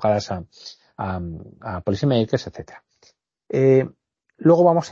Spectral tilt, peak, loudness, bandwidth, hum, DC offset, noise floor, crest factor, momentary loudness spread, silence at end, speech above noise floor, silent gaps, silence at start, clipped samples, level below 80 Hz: -7.5 dB/octave; -4 dBFS; -21 LUFS; 7.4 kHz; none; under 0.1%; -60 dBFS; 18 dB; 23 LU; 0 s; 40 dB; none; 0 s; under 0.1%; -52 dBFS